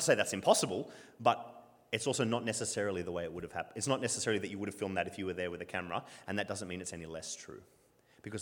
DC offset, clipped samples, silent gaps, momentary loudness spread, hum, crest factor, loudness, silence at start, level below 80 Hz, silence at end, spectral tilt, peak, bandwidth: under 0.1%; under 0.1%; none; 13 LU; none; 24 dB; -35 LUFS; 0 s; -70 dBFS; 0 s; -3.5 dB/octave; -12 dBFS; 19 kHz